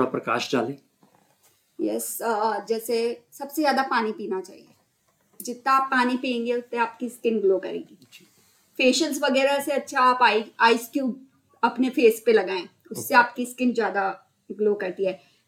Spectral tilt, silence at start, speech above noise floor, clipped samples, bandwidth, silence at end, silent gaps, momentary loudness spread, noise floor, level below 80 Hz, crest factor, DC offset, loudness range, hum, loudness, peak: -3.5 dB/octave; 0 s; 44 dB; under 0.1%; 17 kHz; 0.3 s; none; 13 LU; -68 dBFS; -78 dBFS; 20 dB; under 0.1%; 5 LU; none; -24 LUFS; -4 dBFS